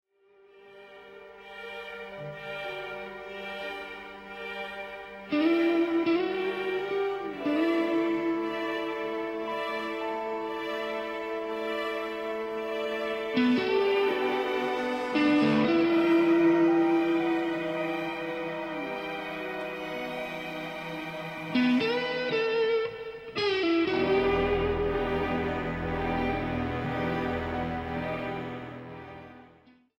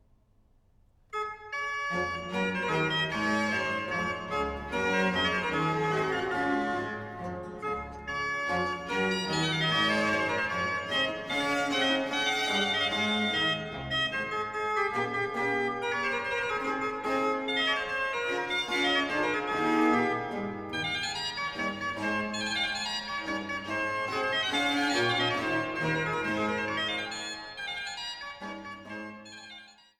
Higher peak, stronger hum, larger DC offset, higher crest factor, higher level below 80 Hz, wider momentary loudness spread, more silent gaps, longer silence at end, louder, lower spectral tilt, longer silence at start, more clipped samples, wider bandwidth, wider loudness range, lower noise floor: about the same, -14 dBFS vs -12 dBFS; neither; neither; about the same, 16 dB vs 18 dB; first, -50 dBFS vs -58 dBFS; first, 15 LU vs 10 LU; neither; first, 0.55 s vs 0.25 s; about the same, -29 LUFS vs -29 LUFS; first, -6.5 dB/octave vs -4 dB/octave; second, 0.55 s vs 1.1 s; neither; second, 12.5 kHz vs 17.5 kHz; first, 10 LU vs 4 LU; second, -60 dBFS vs -64 dBFS